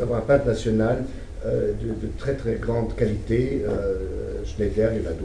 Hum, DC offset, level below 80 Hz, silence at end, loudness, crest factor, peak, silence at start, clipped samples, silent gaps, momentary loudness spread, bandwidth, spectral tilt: none; under 0.1%; -34 dBFS; 0 s; -25 LUFS; 18 dB; -6 dBFS; 0 s; under 0.1%; none; 9 LU; 10.5 kHz; -8 dB/octave